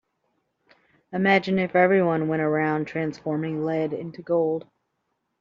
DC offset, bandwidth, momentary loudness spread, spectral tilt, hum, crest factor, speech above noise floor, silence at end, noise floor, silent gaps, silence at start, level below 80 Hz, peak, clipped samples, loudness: under 0.1%; 7.2 kHz; 10 LU; -5.5 dB/octave; none; 18 dB; 53 dB; 0.8 s; -76 dBFS; none; 1.1 s; -66 dBFS; -6 dBFS; under 0.1%; -24 LUFS